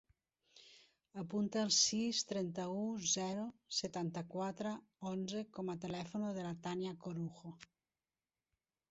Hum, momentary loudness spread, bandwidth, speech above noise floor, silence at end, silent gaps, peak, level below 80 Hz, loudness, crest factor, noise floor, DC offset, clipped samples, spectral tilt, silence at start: none; 13 LU; 8 kHz; over 50 dB; 1.25 s; none; -18 dBFS; -78 dBFS; -39 LUFS; 24 dB; under -90 dBFS; under 0.1%; under 0.1%; -4.5 dB/octave; 0.55 s